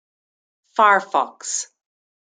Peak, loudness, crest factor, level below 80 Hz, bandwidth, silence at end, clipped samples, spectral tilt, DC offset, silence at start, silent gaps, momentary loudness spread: -2 dBFS; -19 LUFS; 20 dB; -80 dBFS; 9.6 kHz; 0.65 s; under 0.1%; -1 dB/octave; under 0.1%; 0.75 s; none; 12 LU